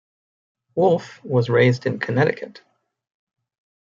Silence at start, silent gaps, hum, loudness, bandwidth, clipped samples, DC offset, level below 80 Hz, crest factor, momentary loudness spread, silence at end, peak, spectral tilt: 0.75 s; none; none; -20 LUFS; 7.4 kHz; under 0.1%; under 0.1%; -64 dBFS; 18 dB; 13 LU; 1.45 s; -4 dBFS; -7.5 dB/octave